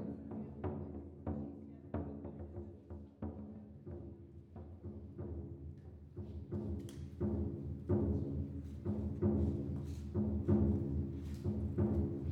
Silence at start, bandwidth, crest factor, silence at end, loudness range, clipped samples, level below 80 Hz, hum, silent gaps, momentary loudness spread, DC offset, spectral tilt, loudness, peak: 0 s; 7 kHz; 20 dB; 0 s; 12 LU; under 0.1%; -52 dBFS; none; none; 16 LU; under 0.1%; -10.5 dB/octave; -41 LUFS; -20 dBFS